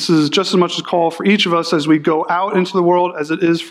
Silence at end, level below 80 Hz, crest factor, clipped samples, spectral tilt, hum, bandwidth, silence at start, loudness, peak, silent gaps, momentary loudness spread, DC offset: 0 s; -66 dBFS; 12 dB; under 0.1%; -5 dB/octave; none; 12.5 kHz; 0 s; -15 LUFS; -2 dBFS; none; 3 LU; under 0.1%